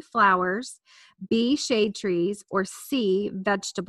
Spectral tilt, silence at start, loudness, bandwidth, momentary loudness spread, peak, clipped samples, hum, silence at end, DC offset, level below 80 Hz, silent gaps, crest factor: -4.5 dB/octave; 0.15 s; -25 LUFS; 13 kHz; 8 LU; -8 dBFS; under 0.1%; none; 0.05 s; under 0.1%; -64 dBFS; none; 18 dB